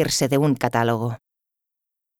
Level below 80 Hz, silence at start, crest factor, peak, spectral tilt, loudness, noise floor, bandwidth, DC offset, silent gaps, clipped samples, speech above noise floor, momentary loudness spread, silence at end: -54 dBFS; 0 s; 18 dB; -4 dBFS; -5 dB/octave; -21 LUFS; -84 dBFS; 18.5 kHz; under 0.1%; none; under 0.1%; 64 dB; 10 LU; 1.05 s